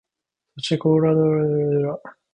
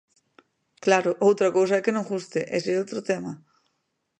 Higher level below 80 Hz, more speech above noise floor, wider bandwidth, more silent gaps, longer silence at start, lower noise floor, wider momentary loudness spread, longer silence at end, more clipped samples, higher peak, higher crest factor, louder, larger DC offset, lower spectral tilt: first, -58 dBFS vs -74 dBFS; first, 63 dB vs 53 dB; about the same, 9.6 kHz vs 9.6 kHz; neither; second, 0.55 s vs 0.85 s; first, -83 dBFS vs -76 dBFS; about the same, 11 LU vs 9 LU; second, 0.2 s vs 0.85 s; neither; second, -8 dBFS vs -4 dBFS; second, 14 dB vs 22 dB; first, -20 LUFS vs -24 LUFS; neither; first, -7.5 dB/octave vs -5 dB/octave